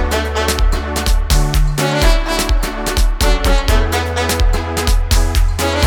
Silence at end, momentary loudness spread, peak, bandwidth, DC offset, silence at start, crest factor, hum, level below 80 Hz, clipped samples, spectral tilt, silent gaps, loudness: 0 s; 3 LU; 0 dBFS; 20 kHz; under 0.1%; 0 s; 14 dB; none; -14 dBFS; under 0.1%; -4 dB/octave; none; -16 LUFS